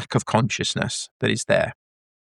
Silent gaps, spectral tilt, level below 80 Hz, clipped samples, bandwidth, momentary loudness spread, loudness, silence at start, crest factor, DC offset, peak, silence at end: 1.11-1.20 s; -4 dB/octave; -54 dBFS; under 0.1%; 12 kHz; 5 LU; -23 LUFS; 0 s; 20 dB; under 0.1%; -4 dBFS; 0.65 s